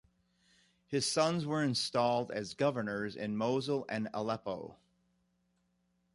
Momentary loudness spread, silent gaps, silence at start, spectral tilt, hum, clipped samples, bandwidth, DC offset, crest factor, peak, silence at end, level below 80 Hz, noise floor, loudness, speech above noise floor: 8 LU; none; 0.9 s; -4.5 dB/octave; 60 Hz at -60 dBFS; under 0.1%; 11.5 kHz; under 0.1%; 20 dB; -16 dBFS; 1.4 s; -72 dBFS; -77 dBFS; -34 LUFS; 43 dB